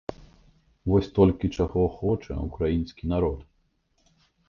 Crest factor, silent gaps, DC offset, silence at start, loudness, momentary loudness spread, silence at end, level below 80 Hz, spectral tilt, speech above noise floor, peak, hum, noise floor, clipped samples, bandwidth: 22 dB; none; under 0.1%; 0.1 s; -26 LUFS; 12 LU; 1.05 s; -38 dBFS; -9 dB/octave; 45 dB; -6 dBFS; none; -69 dBFS; under 0.1%; 7 kHz